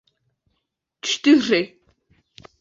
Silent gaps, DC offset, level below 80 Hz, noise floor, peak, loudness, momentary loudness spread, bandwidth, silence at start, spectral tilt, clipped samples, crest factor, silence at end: none; under 0.1%; -66 dBFS; -77 dBFS; -4 dBFS; -19 LUFS; 14 LU; 7.8 kHz; 1.05 s; -3 dB/octave; under 0.1%; 20 dB; 0.95 s